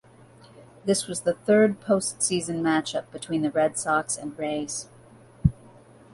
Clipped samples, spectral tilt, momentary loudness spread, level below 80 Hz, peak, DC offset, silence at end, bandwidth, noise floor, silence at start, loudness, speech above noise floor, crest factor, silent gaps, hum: under 0.1%; -4.5 dB/octave; 11 LU; -48 dBFS; -4 dBFS; under 0.1%; 0.6 s; 11.5 kHz; -52 dBFS; 0.6 s; -25 LUFS; 27 dB; 22 dB; none; none